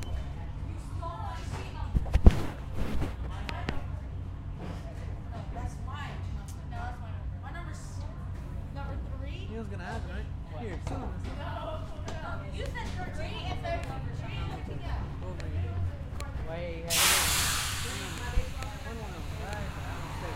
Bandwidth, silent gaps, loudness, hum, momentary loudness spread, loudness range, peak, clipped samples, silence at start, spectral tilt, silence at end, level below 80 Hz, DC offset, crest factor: 16 kHz; none; -34 LUFS; none; 13 LU; 10 LU; -2 dBFS; under 0.1%; 0 s; -3.5 dB/octave; 0 s; -36 dBFS; under 0.1%; 30 dB